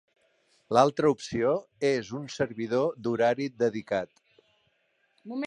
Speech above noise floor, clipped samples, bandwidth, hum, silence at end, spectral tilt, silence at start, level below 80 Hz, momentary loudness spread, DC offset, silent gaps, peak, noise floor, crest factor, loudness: 45 dB; under 0.1%; 11 kHz; none; 0 s; -5.5 dB/octave; 0.7 s; -66 dBFS; 9 LU; under 0.1%; none; -6 dBFS; -72 dBFS; 22 dB; -28 LUFS